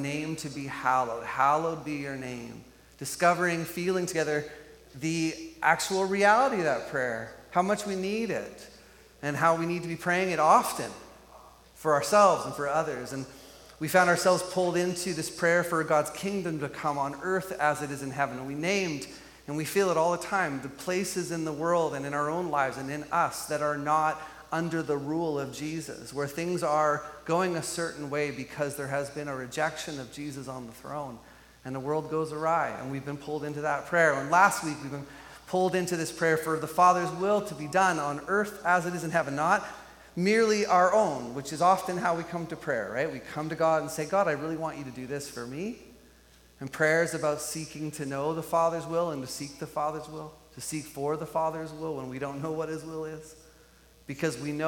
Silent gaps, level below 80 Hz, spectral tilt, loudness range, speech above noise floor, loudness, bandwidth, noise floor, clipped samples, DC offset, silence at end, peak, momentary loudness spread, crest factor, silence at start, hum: none; -62 dBFS; -4.5 dB/octave; 7 LU; 29 dB; -28 LUFS; 17.5 kHz; -57 dBFS; under 0.1%; under 0.1%; 0 s; -6 dBFS; 14 LU; 22 dB; 0 s; none